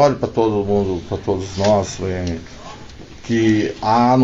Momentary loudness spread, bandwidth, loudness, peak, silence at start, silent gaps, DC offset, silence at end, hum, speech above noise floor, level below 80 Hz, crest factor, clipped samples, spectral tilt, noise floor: 20 LU; 8 kHz; -19 LUFS; -2 dBFS; 0 s; none; under 0.1%; 0 s; none; 19 dB; -40 dBFS; 16 dB; under 0.1%; -6.5 dB/octave; -36 dBFS